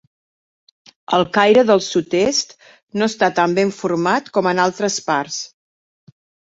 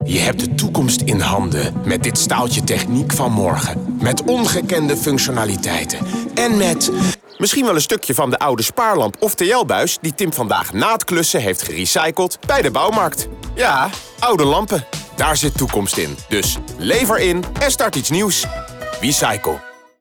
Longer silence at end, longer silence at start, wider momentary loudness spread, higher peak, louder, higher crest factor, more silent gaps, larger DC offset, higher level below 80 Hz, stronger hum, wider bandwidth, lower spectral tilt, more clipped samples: first, 1.05 s vs 0.3 s; first, 1.1 s vs 0 s; first, 11 LU vs 5 LU; first, -2 dBFS vs -6 dBFS; about the same, -17 LUFS vs -17 LUFS; first, 18 dB vs 12 dB; first, 2.83-2.87 s vs none; neither; second, -60 dBFS vs -38 dBFS; neither; second, 8 kHz vs over 20 kHz; about the same, -4 dB/octave vs -3.5 dB/octave; neither